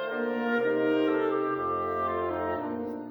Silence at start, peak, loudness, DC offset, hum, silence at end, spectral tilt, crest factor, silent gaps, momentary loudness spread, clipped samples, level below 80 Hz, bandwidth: 0 s; -16 dBFS; -29 LUFS; under 0.1%; none; 0 s; -8 dB/octave; 12 dB; none; 6 LU; under 0.1%; -64 dBFS; over 20 kHz